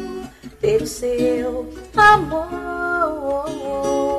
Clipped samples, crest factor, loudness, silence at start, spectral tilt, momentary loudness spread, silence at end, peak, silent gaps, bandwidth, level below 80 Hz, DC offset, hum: under 0.1%; 18 dB; -19 LUFS; 0 s; -4.5 dB/octave; 15 LU; 0 s; -2 dBFS; none; 14.5 kHz; -42 dBFS; under 0.1%; none